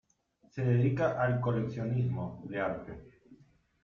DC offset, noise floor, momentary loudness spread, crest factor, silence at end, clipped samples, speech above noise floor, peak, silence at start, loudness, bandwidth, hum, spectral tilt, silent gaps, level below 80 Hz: under 0.1%; -69 dBFS; 15 LU; 16 dB; 0.5 s; under 0.1%; 38 dB; -16 dBFS; 0.55 s; -32 LUFS; 6.6 kHz; none; -9.5 dB/octave; none; -60 dBFS